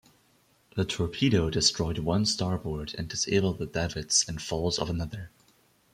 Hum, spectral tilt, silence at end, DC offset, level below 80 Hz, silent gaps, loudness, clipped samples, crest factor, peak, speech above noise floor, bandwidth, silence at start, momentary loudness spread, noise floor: none; -4 dB/octave; 0.65 s; under 0.1%; -48 dBFS; none; -28 LUFS; under 0.1%; 20 dB; -8 dBFS; 37 dB; 15.5 kHz; 0.75 s; 10 LU; -65 dBFS